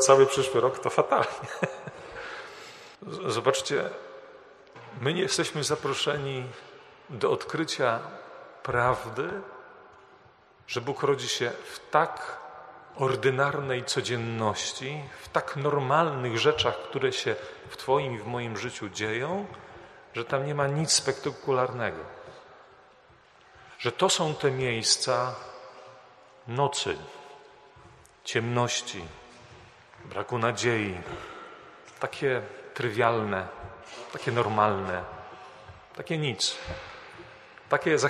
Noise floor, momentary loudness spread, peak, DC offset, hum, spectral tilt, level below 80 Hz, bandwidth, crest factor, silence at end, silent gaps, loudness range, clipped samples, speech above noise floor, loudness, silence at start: -57 dBFS; 21 LU; -4 dBFS; under 0.1%; none; -3.5 dB/octave; -62 dBFS; 13 kHz; 24 dB; 0 s; none; 5 LU; under 0.1%; 30 dB; -28 LUFS; 0 s